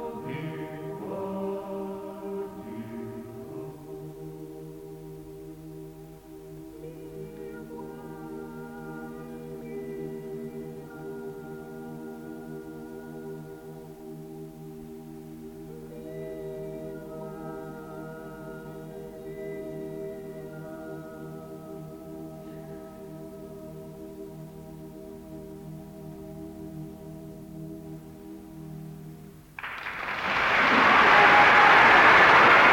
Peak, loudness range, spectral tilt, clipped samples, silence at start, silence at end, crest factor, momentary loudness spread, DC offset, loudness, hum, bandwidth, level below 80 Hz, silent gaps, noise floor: -6 dBFS; 19 LU; -4.5 dB/octave; under 0.1%; 0 s; 0 s; 22 dB; 25 LU; under 0.1%; -21 LUFS; none; 17.5 kHz; -58 dBFS; none; -46 dBFS